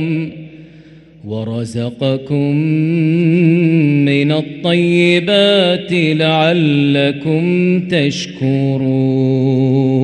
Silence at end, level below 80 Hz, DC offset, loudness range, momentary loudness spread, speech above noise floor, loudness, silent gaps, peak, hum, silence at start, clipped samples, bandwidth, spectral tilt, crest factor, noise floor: 0 s; -56 dBFS; under 0.1%; 3 LU; 9 LU; 27 dB; -14 LUFS; none; 0 dBFS; none; 0 s; under 0.1%; 9.4 kHz; -7 dB/octave; 12 dB; -40 dBFS